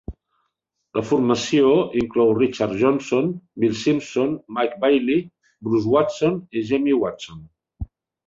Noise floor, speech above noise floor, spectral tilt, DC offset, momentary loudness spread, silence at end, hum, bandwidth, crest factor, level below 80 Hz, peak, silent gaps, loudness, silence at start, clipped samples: -76 dBFS; 56 dB; -6 dB/octave; under 0.1%; 15 LU; 0.4 s; none; 7.8 kHz; 18 dB; -48 dBFS; -4 dBFS; none; -21 LUFS; 0.1 s; under 0.1%